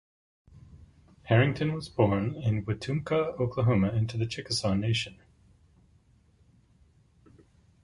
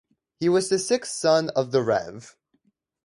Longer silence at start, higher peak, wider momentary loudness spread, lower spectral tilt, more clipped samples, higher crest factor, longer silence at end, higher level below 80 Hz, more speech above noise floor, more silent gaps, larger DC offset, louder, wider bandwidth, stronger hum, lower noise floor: first, 0.55 s vs 0.4 s; about the same, -8 dBFS vs -6 dBFS; about the same, 7 LU vs 6 LU; first, -6.5 dB/octave vs -4.5 dB/octave; neither; about the same, 22 dB vs 18 dB; first, 2.75 s vs 0.75 s; first, -52 dBFS vs -66 dBFS; second, 36 dB vs 46 dB; neither; neither; second, -28 LUFS vs -23 LUFS; about the same, 11.5 kHz vs 11.5 kHz; neither; second, -63 dBFS vs -69 dBFS